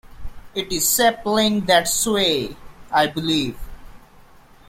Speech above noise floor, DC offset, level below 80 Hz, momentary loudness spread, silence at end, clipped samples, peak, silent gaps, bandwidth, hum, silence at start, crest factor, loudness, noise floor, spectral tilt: 28 dB; under 0.1%; -42 dBFS; 13 LU; 0.7 s; under 0.1%; -2 dBFS; none; 16.5 kHz; none; 0.05 s; 18 dB; -19 LUFS; -47 dBFS; -2.5 dB/octave